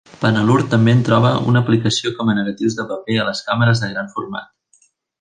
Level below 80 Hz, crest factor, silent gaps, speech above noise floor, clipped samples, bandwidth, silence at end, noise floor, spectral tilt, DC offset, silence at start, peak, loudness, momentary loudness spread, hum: -52 dBFS; 16 dB; none; 42 dB; under 0.1%; 9.6 kHz; 0.75 s; -58 dBFS; -6 dB/octave; under 0.1%; 0.2 s; -2 dBFS; -17 LUFS; 11 LU; none